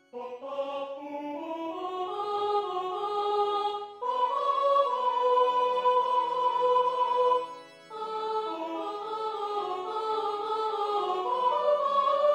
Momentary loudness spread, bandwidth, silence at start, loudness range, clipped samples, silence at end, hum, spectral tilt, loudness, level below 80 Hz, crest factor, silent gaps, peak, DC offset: 11 LU; 10 kHz; 0.15 s; 7 LU; under 0.1%; 0 s; none; -3.5 dB/octave; -28 LUFS; -84 dBFS; 16 dB; none; -14 dBFS; under 0.1%